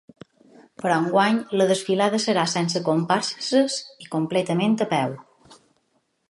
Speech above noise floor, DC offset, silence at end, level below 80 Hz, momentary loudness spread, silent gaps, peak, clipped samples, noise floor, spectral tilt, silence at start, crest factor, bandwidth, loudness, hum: 48 dB; under 0.1%; 0.75 s; -72 dBFS; 8 LU; none; -4 dBFS; under 0.1%; -70 dBFS; -4.5 dB/octave; 0.8 s; 18 dB; 11.5 kHz; -22 LUFS; none